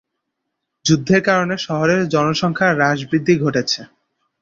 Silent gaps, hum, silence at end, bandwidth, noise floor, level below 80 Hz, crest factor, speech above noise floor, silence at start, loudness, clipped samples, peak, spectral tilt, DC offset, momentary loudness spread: none; none; 0.55 s; 7.6 kHz; -77 dBFS; -54 dBFS; 16 dB; 60 dB; 0.85 s; -17 LUFS; under 0.1%; -2 dBFS; -5 dB/octave; under 0.1%; 6 LU